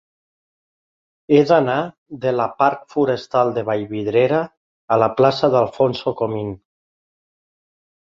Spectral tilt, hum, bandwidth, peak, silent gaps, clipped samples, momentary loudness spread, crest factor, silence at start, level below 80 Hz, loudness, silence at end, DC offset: -7.5 dB/octave; none; 7.4 kHz; -2 dBFS; 1.98-2.06 s, 4.57-4.88 s; under 0.1%; 10 LU; 18 dB; 1.3 s; -58 dBFS; -18 LUFS; 1.55 s; under 0.1%